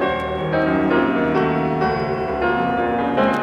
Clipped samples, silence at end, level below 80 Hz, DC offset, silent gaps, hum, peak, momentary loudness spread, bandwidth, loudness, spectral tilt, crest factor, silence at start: under 0.1%; 0 s; -42 dBFS; under 0.1%; none; none; -4 dBFS; 4 LU; 10 kHz; -19 LUFS; -8 dB/octave; 14 dB; 0 s